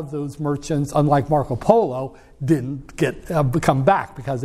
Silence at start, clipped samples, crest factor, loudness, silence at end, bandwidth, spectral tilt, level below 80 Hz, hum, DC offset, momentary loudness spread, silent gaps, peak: 0 s; under 0.1%; 20 dB; -20 LUFS; 0 s; 14 kHz; -7.5 dB/octave; -42 dBFS; none; under 0.1%; 11 LU; none; 0 dBFS